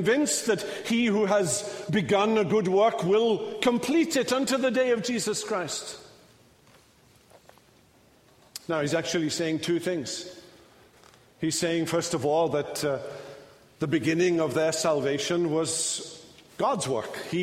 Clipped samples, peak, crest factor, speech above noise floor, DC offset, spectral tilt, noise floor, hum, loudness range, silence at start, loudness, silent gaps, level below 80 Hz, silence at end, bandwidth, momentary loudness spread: under 0.1%; -10 dBFS; 16 dB; 33 dB; under 0.1%; -4 dB/octave; -59 dBFS; none; 9 LU; 0 s; -26 LUFS; none; -66 dBFS; 0 s; 16 kHz; 11 LU